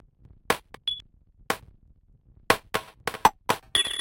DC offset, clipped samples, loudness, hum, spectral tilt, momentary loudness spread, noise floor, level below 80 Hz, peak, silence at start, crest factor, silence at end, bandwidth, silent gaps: under 0.1%; under 0.1%; -27 LUFS; none; -2 dB/octave; 9 LU; -58 dBFS; -54 dBFS; -4 dBFS; 0.5 s; 26 dB; 0 s; 17 kHz; none